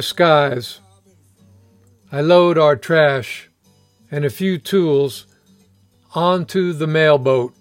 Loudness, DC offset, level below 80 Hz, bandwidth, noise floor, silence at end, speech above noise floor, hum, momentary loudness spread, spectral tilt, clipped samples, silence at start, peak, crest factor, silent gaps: -16 LUFS; under 0.1%; -68 dBFS; 16.5 kHz; -56 dBFS; 0.15 s; 40 dB; none; 15 LU; -6 dB/octave; under 0.1%; 0 s; 0 dBFS; 18 dB; none